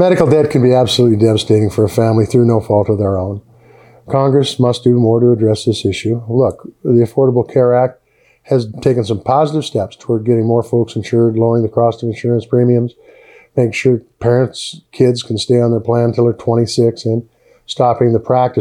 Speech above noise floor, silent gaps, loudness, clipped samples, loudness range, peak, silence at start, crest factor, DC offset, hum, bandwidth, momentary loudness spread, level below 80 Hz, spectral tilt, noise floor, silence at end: 31 dB; none; -14 LUFS; under 0.1%; 2 LU; 0 dBFS; 0 s; 14 dB; under 0.1%; none; 12 kHz; 8 LU; -50 dBFS; -7 dB/octave; -44 dBFS; 0 s